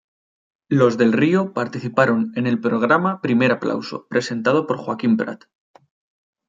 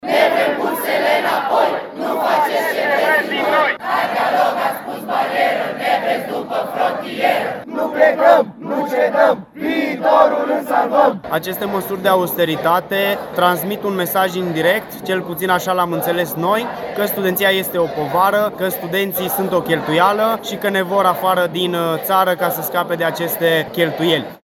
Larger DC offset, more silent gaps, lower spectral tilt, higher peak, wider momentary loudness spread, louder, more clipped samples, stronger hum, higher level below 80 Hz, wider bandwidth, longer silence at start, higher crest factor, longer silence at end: neither; neither; first, -7 dB/octave vs -4.5 dB/octave; about the same, -2 dBFS vs 0 dBFS; about the same, 8 LU vs 7 LU; about the same, -19 LUFS vs -17 LUFS; neither; neither; second, -64 dBFS vs -58 dBFS; second, 7.8 kHz vs 19.5 kHz; first, 0.7 s vs 0.05 s; about the same, 18 dB vs 16 dB; first, 1.1 s vs 0.1 s